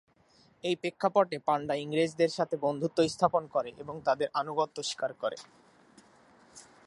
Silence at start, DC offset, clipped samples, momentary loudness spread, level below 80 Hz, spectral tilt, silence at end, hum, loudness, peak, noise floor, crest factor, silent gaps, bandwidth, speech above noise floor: 0.65 s; under 0.1%; under 0.1%; 7 LU; -72 dBFS; -5 dB/octave; 0.25 s; none; -31 LUFS; -10 dBFS; -64 dBFS; 22 dB; none; 11.5 kHz; 34 dB